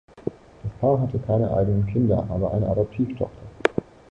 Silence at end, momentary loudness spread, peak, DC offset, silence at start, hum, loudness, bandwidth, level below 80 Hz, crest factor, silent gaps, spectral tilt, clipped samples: 0.3 s; 13 LU; -2 dBFS; under 0.1%; 0.15 s; none; -24 LUFS; 9 kHz; -42 dBFS; 22 dB; none; -9 dB/octave; under 0.1%